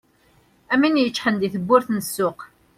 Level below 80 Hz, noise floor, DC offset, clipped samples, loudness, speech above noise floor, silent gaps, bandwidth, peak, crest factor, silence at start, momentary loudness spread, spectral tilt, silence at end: -62 dBFS; -58 dBFS; under 0.1%; under 0.1%; -21 LUFS; 38 dB; none; 16.5 kHz; -2 dBFS; 20 dB; 0.7 s; 7 LU; -4.5 dB/octave; 0.3 s